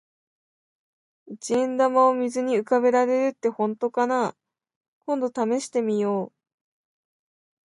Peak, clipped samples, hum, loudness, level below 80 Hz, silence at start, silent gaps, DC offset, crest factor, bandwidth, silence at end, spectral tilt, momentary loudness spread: -8 dBFS; under 0.1%; none; -23 LUFS; -76 dBFS; 1.25 s; 4.76-4.81 s, 4.88-5.01 s; under 0.1%; 18 dB; 11.5 kHz; 1.4 s; -5 dB/octave; 10 LU